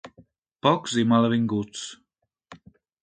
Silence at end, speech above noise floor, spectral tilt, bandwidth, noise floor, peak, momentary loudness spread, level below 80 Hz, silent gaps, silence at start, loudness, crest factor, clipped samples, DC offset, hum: 0.45 s; 35 dB; -5.5 dB/octave; 9.2 kHz; -57 dBFS; -4 dBFS; 15 LU; -62 dBFS; 0.38-0.42 s; 0.05 s; -23 LUFS; 22 dB; under 0.1%; under 0.1%; none